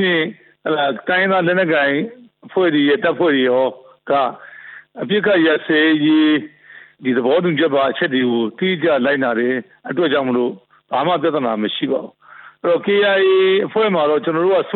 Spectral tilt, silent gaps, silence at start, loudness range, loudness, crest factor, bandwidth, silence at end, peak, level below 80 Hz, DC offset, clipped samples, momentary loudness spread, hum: -10.5 dB/octave; none; 0 s; 3 LU; -17 LUFS; 12 dB; 4.3 kHz; 0 s; -4 dBFS; -64 dBFS; under 0.1%; under 0.1%; 11 LU; none